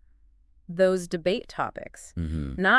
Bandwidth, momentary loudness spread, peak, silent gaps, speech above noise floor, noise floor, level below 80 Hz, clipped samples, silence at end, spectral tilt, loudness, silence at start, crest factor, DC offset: 12 kHz; 15 LU; -8 dBFS; none; 33 dB; -58 dBFS; -44 dBFS; under 0.1%; 0 s; -5.5 dB/octave; -28 LUFS; 0.7 s; 18 dB; under 0.1%